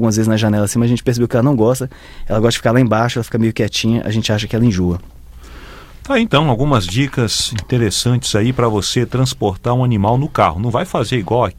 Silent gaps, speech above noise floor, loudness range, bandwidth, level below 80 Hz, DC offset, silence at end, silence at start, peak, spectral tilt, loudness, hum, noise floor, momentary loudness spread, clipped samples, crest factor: none; 20 dB; 2 LU; 15.5 kHz; -34 dBFS; under 0.1%; 0.05 s; 0 s; 0 dBFS; -5.5 dB/octave; -16 LUFS; none; -35 dBFS; 4 LU; under 0.1%; 14 dB